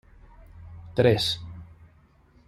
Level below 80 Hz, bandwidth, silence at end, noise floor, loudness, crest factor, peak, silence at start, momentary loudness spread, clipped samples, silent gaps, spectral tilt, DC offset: -52 dBFS; 15 kHz; 0.85 s; -58 dBFS; -24 LUFS; 22 dB; -6 dBFS; 0.55 s; 25 LU; under 0.1%; none; -5.5 dB/octave; under 0.1%